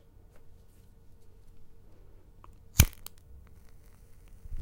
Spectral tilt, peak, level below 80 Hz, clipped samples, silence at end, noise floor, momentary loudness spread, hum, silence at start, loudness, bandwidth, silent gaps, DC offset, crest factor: -3.5 dB/octave; 0 dBFS; -40 dBFS; under 0.1%; 0 s; -55 dBFS; 30 LU; none; 0.35 s; -27 LUFS; 16.5 kHz; none; under 0.1%; 34 dB